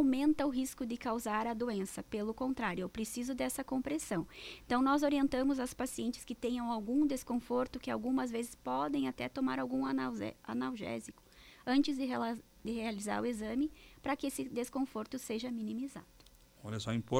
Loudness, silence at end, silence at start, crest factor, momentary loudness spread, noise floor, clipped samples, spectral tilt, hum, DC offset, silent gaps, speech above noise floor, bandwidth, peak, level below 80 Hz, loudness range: -36 LUFS; 0 s; 0 s; 18 dB; 10 LU; -61 dBFS; under 0.1%; -5 dB/octave; none; under 0.1%; none; 26 dB; 16.5 kHz; -18 dBFS; -62 dBFS; 4 LU